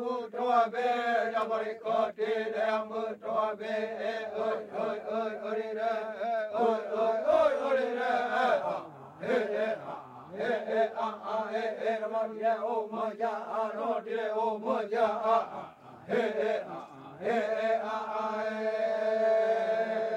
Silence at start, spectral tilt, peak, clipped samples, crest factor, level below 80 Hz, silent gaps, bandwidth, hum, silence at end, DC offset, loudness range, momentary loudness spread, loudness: 0 s; -5 dB/octave; -14 dBFS; under 0.1%; 18 dB; -80 dBFS; none; 9.4 kHz; none; 0 s; under 0.1%; 4 LU; 8 LU; -31 LUFS